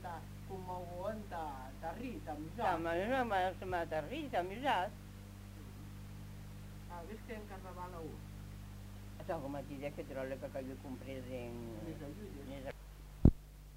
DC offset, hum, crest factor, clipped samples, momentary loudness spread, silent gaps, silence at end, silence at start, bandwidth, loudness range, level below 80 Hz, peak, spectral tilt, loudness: under 0.1%; 50 Hz at -50 dBFS; 32 dB; under 0.1%; 16 LU; none; 0 s; 0 s; 16 kHz; 12 LU; -48 dBFS; -8 dBFS; -6.5 dB/octave; -41 LUFS